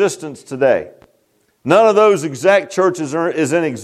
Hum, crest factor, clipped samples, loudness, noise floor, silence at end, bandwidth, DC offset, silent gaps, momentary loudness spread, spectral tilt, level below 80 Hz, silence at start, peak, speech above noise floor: none; 14 dB; under 0.1%; -15 LUFS; -60 dBFS; 0 s; 14 kHz; under 0.1%; none; 17 LU; -5 dB/octave; -64 dBFS; 0 s; 0 dBFS; 46 dB